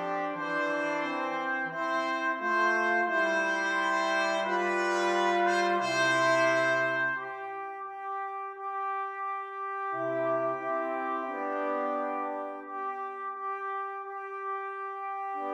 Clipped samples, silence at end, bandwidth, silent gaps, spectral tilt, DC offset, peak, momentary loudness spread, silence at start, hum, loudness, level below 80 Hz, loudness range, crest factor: under 0.1%; 0 s; 12.5 kHz; none; -3.5 dB/octave; under 0.1%; -16 dBFS; 11 LU; 0 s; none; -30 LUFS; -90 dBFS; 8 LU; 16 dB